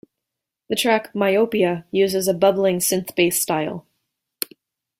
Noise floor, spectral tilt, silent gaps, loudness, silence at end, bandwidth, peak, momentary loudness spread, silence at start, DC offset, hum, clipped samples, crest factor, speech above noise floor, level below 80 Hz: -84 dBFS; -3.5 dB/octave; none; -20 LUFS; 1.2 s; 16.5 kHz; 0 dBFS; 12 LU; 0.7 s; under 0.1%; none; under 0.1%; 20 dB; 64 dB; -62 dBFS